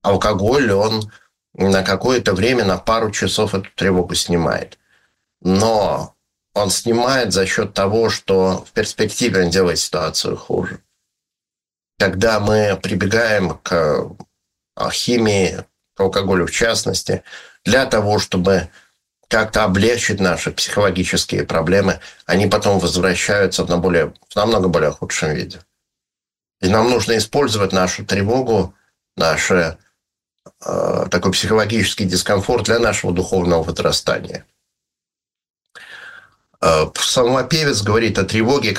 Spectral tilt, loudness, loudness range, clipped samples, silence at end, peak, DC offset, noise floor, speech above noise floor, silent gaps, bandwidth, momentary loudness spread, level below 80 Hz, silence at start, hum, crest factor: -4 dB/octave; -17 LUFS; 3 LU; under 0.1%; 0 s; -2 dBFS; under 0.1%; under -90 dBFS; over 73 dB; 35.50-35.54 s; 16 kHz; 8 LU; -42 dBFS; 0.05 s; none; 16 dB